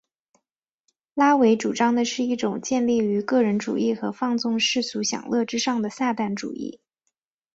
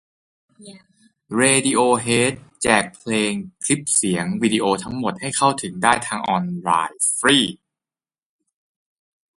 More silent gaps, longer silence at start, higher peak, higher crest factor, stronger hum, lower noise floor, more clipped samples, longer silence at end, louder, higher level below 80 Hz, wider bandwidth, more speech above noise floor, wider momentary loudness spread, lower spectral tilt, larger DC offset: neither; first, 1.15 s vs 0.6 s; second, -6 dBFS vs 0 dBFS; about the same, 18 dB vs 22 dB; neither; second, -83 dBFS vs under -90 dBFS; neither; second, 0.8 s vs 1.85 s; second, -23 LUFS vs -19 LUFS; second, -68 dBFS vs -56 dBFS; second, 8 kHz vs 12 kHz; second, 61 dB vs over 70 dB; about the same, 8 LU vs 8 LU; about the same, -4 dB/octave vs -3 dB/octave; neither